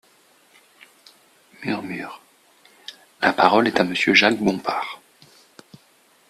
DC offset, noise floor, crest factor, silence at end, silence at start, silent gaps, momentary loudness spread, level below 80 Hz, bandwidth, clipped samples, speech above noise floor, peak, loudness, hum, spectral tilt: under 0.1%; -57 dBFS; 24 dB; 1.35 s; 1.6 s; none; 25 LU; -64 dBFS; 14.5 kHz; under 0.1%; 38 dB; 0 dBFS; -19 LUFS; none; -4.5 dB/octave